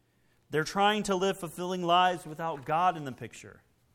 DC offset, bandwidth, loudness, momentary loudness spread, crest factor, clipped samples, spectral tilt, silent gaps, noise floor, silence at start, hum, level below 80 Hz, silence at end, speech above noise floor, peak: under 0.1%; 17.5 kHz; -29 LUFS; 16 LU; 18 dB; under 0.1%; -4.5 dB/octave; none; -68 dBFS; 0.5 s; none; -64 dBFS; 0.4 s; 39 dB; -12 dBFS